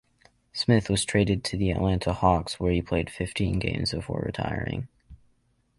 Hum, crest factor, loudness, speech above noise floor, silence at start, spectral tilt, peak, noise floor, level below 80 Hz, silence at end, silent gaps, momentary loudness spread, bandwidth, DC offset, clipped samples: none; 20 dB; -26 LUFS; 42 dB; 0.55 s; -5.5 dB/octave; -8 dBFS; -68 dBFS; -40 dBFS; 0.65 s; none; 8 LU; 11.5 kHz; under 0.1%; under 0.1%